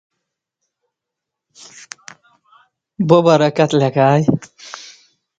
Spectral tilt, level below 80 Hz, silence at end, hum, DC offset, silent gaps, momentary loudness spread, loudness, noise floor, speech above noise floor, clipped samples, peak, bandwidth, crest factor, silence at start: -6.5 dB/octave; -58 dBFS; 0.6 s; none; under 0.1%; none; 23 LU; -14 LUFS; -82 dBFS; 68 dB; under 0.1%; 0 dBFS; 9 kHz; 18 dB; 3 s